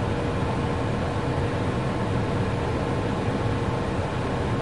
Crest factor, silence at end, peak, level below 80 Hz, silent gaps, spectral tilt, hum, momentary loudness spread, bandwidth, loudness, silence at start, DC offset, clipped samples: 12 dB; 0 s; -12 dBFS; -38 dBFS; none; -7 dB/octave; none; 1 LU; 11.5 kHz; -26 LUFS; 0 s; 0.6%; under 0.1%